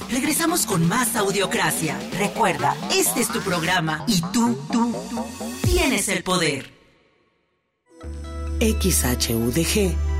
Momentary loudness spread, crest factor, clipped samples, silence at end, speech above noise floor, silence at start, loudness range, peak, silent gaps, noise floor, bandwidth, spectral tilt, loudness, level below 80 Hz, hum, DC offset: 10 LU; 14 dB; under 0.1%; 0 s; 49 dB; 0 s; 4 LU; -8 dBFS; none; -70 dBFS; 16 kHz; -4 dB/octave; -21 LUFS; -32 dBFS; none; under 0.1%